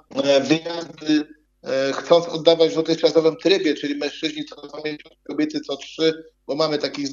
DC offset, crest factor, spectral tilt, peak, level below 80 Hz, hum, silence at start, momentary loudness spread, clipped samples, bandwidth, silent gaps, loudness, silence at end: under 0.1%; 22 dB; -4.5 dB/octave; 0 dBFS; -66 dBFS; none; 0.1 s; 14 LU; under 0.1%; 7.6 kHz; none; -21 LUFS; 0 s